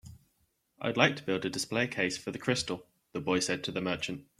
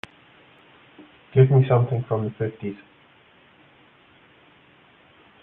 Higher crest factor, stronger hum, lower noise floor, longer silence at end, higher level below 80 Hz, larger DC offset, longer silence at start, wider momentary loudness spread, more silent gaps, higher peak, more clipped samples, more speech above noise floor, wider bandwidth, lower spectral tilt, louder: first, 28 dB vs 22 dB; neither; first, -75 dBFS vs -55 dBFS; second, 0.15 s vs 2.65 s; about the same, -66 dBFS vs -64 dBFS; neither; second, 0.05 s vs 1.35 s; second, 11 LU vs 20 LU; neither; about the same, -6 dBFS vs -4 dBFS; neither; first, 43 dB vs 35 dB; first, 15.5 kHz vs 3.8 kHz; second, -4 dB/octave vs -10.5 dB/octave; second, -31 LUFS vs -21 LUFS